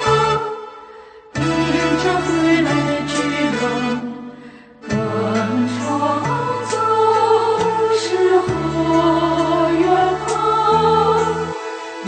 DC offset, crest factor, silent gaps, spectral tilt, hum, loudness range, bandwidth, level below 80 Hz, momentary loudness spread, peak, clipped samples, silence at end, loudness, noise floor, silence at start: under 0.1%; 14 dB; none; -5.5 dB/octave; none; 5 LU; 9.2 kHz; -44 dBFS; 10 LU; -4 dBFS; under 0.1%; 0 s; -17 LUFS; -40 dBFS; 0 s